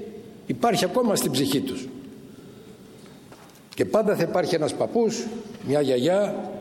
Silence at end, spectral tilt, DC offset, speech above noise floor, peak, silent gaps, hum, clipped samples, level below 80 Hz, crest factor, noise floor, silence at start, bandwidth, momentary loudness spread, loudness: 0 s; -5 dB/octave; under 0.1%; 24 dB; -8 dBFS; none; none; under 0.1%; -62 dBFS; 16 dB; -47 dBFS; 0 s; 16.5 kHz; 20 LU; -24 LUFS